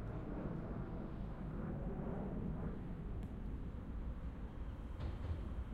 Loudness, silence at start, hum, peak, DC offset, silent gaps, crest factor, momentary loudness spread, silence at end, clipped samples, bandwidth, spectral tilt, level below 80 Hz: -46 LUFS; 0 s; none; -32 dBFS; under 0.1%; none; 12 dB; 4 LU; 0 s; under 0.1%; 5 kHz; -9.5 dB/octave; -48 dBFS